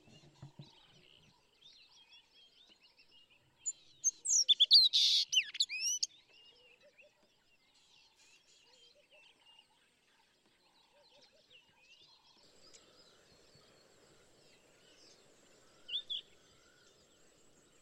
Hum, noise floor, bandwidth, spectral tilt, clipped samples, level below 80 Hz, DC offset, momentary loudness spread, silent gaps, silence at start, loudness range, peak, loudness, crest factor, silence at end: none; -72 dBFS; 16 kHz; 3 dB/octave; under 0.1%; -84 dBFS; under 0.1%; 20 LU; none; 0.4 s; 19 LU; -14 dBFS; -29 LUFS; 26 dB; 1.6 s